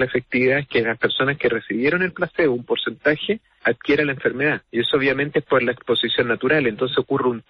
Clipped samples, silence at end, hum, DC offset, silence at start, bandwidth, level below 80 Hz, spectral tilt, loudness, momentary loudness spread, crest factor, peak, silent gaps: under 0.1%; 0.1 s; none; under 0.1%; 0 s; 10 kHz; -56 dBFS; -7.5 dB/octave; -20 LUFS; 4 LU; 14 dB; -8 dBFS; none